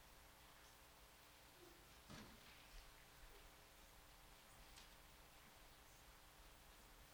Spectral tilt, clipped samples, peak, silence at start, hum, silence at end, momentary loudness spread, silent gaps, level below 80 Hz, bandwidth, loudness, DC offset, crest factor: -2.5 dB/octave; under 0.1%; -48 dBFS; 0 s; none; 0 s; 4 LU; none; -70 dBFS; over 20 kHz; -64 LUFS; under 0.1%; 18 dB